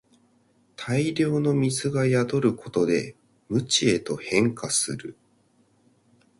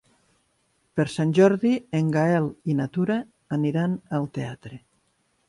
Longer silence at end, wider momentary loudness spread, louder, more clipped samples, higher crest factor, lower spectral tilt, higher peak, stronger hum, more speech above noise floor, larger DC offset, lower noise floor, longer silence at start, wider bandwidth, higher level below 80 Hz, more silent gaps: first, 1.3 s vs 0.7 s; second, 8 LU vs 13 LU; about the same, -24 LUFS vs -24 LUFS; neither; about the same, 20 dB vs 18 dB; second, -4.5 dB/octave vs -7.5 dB/octave; about the same, -6 dBFS vs -6 dBFS; neither; second, 40 dB vs 46 dB; neither; second, -63 dBFS vs -69 dBFS; second, 0.8 s vs 0.95 s; about the same, 11.5 kHz vs 11.5 kHz; about the same, -60 dBFS vs -64 dBFS; neither